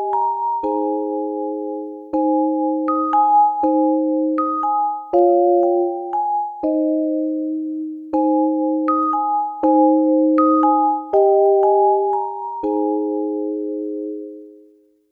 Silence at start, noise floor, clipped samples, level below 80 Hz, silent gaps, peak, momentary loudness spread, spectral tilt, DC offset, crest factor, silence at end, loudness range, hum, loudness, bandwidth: 0 s; -52 dBFS; under 0.1%; -64 dBFS; none; -4 dBFS; 10 LU; -9 dB/octave; under 0.1%; 14 dB; 0.55 s; 5 LU; none; -18 LUFS; 2.7 kHz